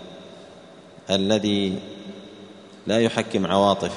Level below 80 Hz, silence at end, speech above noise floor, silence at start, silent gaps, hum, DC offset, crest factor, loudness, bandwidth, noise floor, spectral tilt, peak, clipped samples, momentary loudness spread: -60 dBFS; 0 s; 25 dB; 0 s; none; none; under 0.1%; 20 dB; -22 LUFS; 10.5 kHz; -46 dBFS; -5 dB/octave; -4 dBFS; under 0.1%; 23 LU